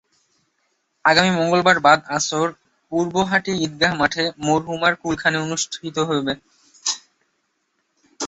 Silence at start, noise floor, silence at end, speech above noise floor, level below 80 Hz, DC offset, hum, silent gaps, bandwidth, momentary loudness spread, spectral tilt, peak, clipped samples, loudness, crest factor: 1.05 s; -71 dBFS; 0 s; 51 dB; -56 dBFS; under 0.1%; none; none; 8.4 kHz; 10 LU; -3.5 dB/octave; 0 dBFS; under 0.1%; -19 LUFS; 20 dB